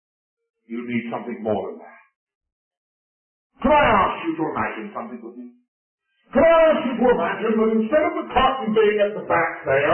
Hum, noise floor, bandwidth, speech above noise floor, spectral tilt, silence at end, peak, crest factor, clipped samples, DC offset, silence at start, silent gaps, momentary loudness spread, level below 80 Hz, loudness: none; under -90 dBFS; 3.3 kHz; over 70 dB; -10.5 dB/octave; 0 s; -6 dBFS; 16 dB; under 0.1%; under 0.1%; 0.7 s; 2.16-2.27 s, 2.35-2.41 s, 2.52-2.71 s, 2.77-3.50 s, 5.68-5.98 s; 17 LU; -46 dBFS; -20 LUFS